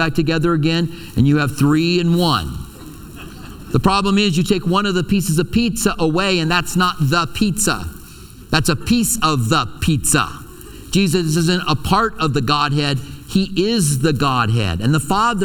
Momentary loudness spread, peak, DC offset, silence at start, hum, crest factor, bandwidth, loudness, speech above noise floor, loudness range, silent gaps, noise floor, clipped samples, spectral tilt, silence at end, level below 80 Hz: 10 LU; 0 dBFS; under 0.1%; 0 s; none; 16 dB; 19 kHz; -17 LUFS; 21 dB; 2 LU; none; -38 dBFS; under 0.1%; -4.5 dB/octave; 0 s; -36 dBFS